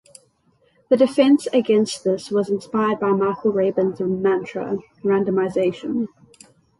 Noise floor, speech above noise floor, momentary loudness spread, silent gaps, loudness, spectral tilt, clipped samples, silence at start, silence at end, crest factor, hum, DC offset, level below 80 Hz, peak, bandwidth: -62 dBFS; 42 dB; 9 LU; none; -20 LUFS; -6 dB/octave; under 0.1%; 0.9 s; 0.75 s; 16 dB; none; under 0.1%; -62 dBFS; -4 dBFS; 11.5 kHz